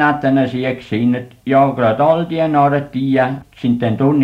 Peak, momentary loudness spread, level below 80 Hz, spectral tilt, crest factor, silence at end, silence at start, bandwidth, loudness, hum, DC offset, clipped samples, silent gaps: 0 dBFS; 7 LU; -52 dBFS; -9 dB/octave; 14 dB; 0 s; 0 s; 7 kHz; -16 LUFS; none; under 0.1%; under 0.1%; none